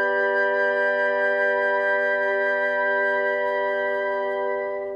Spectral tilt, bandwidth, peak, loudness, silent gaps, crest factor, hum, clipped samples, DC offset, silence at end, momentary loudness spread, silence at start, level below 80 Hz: -4 dB/octave; 6.6 kHz; -12 dBFS; -22 LUFS; none; 10 dB; none; under 0.1%; under 0.1%; 0 s; 4 LU; 0 s; -68 dBFS